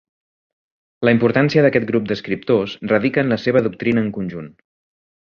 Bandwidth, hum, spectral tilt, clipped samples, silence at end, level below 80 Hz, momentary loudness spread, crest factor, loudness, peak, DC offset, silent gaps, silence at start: 6.8 kHz; none; -8 dB/octave; under 0.1%; 0.75 s; -54 dBFS; 9 LU; 18 dB; -18 LUFS; -2 dBFS; under 0.1%; none; 1 s